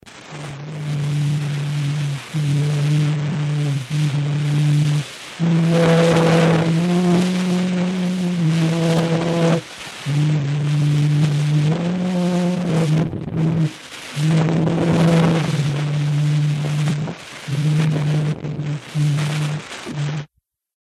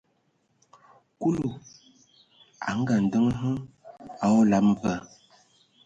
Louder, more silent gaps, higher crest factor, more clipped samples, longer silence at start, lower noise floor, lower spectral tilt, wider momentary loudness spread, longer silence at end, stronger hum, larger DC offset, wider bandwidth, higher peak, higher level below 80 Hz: first, -19 LUFS vs -25 LUFS; neither; about the same, 16 dB vs 16 dB; neither; second, 0.05 s vs 1.2 s; second, -61 dBFS vs -70 dBFS; about the same, -7 dB/octave vs -7 dB/octave; second, 10 LU vs 21 LU; second, 0.55 s vs 0.8 s; neither; neither; first, 12 kHz vs 7.8 kHz; first, -2 dBFS vs -12 dBFS; first, -52 dBFS vs -58 dBFS